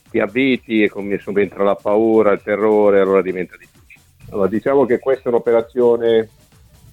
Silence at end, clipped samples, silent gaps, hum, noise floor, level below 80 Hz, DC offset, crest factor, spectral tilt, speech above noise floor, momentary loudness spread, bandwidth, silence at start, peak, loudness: 0.65 s; under 0.1%; none; none; -48 dBFS; -54 dBFS; under 0.1%; 16 dB; -7.5 dB/octave; 32 dB; 9 LU; 9.4 kHz; 0.15 s; 0 dBFS; -16 LUFS